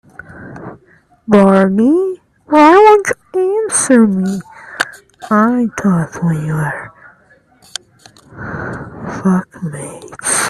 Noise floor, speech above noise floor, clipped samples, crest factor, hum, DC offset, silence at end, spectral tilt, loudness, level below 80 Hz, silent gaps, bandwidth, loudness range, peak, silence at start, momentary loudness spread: -50 dBFS; 39 dB; under 0.1%; 14 dB; none; under 0.1%; 0 s; -5.5 dB/octave; -12 LUFS; -50 dBFS; none; 13.5 kHz; 12 LU; 0 dBFS; 0.3 s; 23 LU